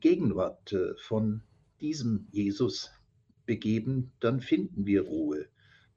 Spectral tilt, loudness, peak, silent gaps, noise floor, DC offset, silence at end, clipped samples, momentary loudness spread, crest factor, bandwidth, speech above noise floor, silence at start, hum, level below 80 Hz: -7 dB/octave; -31 LUFS; -14 dBFS; none; -66 dBFS; under 0.1%; 0.5 s; under 0.1%; 10 LU; 16 dB; 7.6 kHz; 37 dB; 0 s; none; -62 dBFS